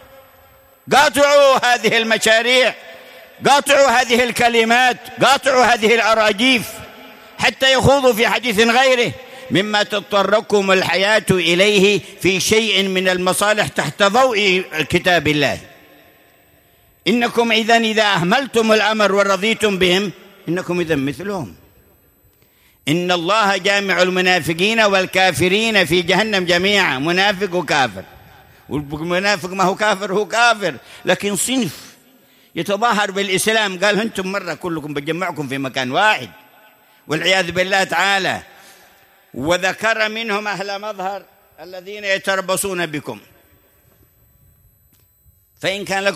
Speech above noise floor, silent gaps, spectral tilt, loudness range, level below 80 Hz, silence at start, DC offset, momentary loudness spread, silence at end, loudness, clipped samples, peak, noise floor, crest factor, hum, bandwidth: 39 dB; none; -3.5 dB/octave; 7 LU; -52 dBFS; 0.85 s; under 0.1%; 12 LU; 0 s; -15 LUFS; under 0.1%; 0 dBFS; -55 dBFS; 16 dB; none; 15.5 kHz